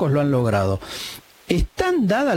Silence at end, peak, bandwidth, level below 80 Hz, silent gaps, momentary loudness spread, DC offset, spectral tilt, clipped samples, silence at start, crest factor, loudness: 0 s; -4 dBFS; 17 kHz; -34 dBFS; none; 12 LU; under 0.1%; -6.5 dB/octave; under 0.1%; 0 s; 16 dB; -21 LUFS